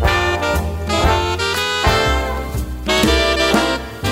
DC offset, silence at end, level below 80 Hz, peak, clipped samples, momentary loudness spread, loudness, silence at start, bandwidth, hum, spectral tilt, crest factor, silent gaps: under 0.1%; 0 s; -24 dBFS; -2 dBFS; under 0.1%; 8 LU; -17 LUFS; 0 s; 16.5 kHz; none; -4 dB/octave; 14 dB; none